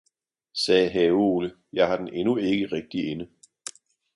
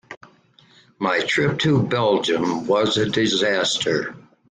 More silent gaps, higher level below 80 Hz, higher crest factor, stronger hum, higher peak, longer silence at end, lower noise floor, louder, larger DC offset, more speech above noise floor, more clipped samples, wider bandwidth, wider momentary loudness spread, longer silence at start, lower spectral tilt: second, none vs 0.17-0.21 s; about the same, -60 dBFS vs -56 dBFS; first, 20 dB vs 14 dB; neither; about the same, -6 dBFS vs -6 dBFS; about the same, 0.45 s vs 0.4 s; first, -68 dBFS vs -54 dBFS; second, -24 LUFS vs -20 LUFS; neither; first, 44 dB vs 34 dB; neither; first, 11.5 kHz vs 9.8 kHz; first, 19 LU vs 4 LU; first, 0.55 s vs 0.1 s; about the same, -5 dB/octave vs -4.5 dB/octave